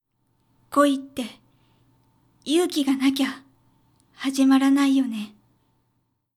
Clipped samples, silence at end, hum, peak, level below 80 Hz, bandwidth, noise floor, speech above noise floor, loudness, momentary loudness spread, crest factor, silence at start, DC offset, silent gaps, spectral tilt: under 0.1%; 1.1 s; none; -6 dBFS; -70 dBFS; 14.5 kHz; -72 dBFS; 51 dB; -22 LUFS; 17 LU; 18 dB; 0.7 s; under 0.1%; none; -3.5 dB/octave